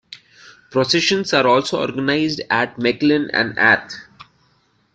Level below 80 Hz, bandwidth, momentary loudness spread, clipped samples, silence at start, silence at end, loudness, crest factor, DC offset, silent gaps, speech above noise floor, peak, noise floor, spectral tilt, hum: -58 dBFS; 9.2 kHz; 7 LU; under 0.1%; 0.1 s; 0.7 s; -17 LUFS; 18 dB; under 0.1%; none; 43 dB; -2 dBFS; -60 dBFS; -4 dB/octave; none